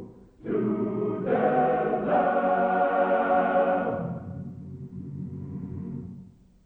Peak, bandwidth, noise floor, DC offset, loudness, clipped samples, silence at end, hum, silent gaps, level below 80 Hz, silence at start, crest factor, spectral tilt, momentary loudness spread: -12 dBFS; 4.1 kHz; -49 dBFS; under 0.1%; -26 LUFS; under 0.1%; 0.4 s; none; none; -58 dBFS; 0 s; 14 dB; -10 dB/octave; 17 LU